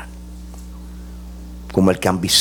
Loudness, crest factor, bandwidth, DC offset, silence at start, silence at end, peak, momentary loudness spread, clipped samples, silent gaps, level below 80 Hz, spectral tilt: -17 LUFS; 20 dB; 18 kHz; under 0.1%; 0 s; 0 s; -2 dBFS; 20 LU; under 0.1%; none; -36 dBFS; -4 dB/octave